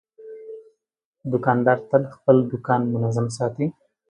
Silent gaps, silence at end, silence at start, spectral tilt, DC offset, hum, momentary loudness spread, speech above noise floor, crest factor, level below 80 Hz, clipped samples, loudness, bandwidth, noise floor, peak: 1.05-1.13 s; 0.4 s; 0.2 s; -8 dB/octave; under 0.1%; none; 21 LU; 34 dB; 20 dB; -62 dBFS; under 0.1%; -22 LUFS; 10 kHz; -54 dBFS; -2 dBFS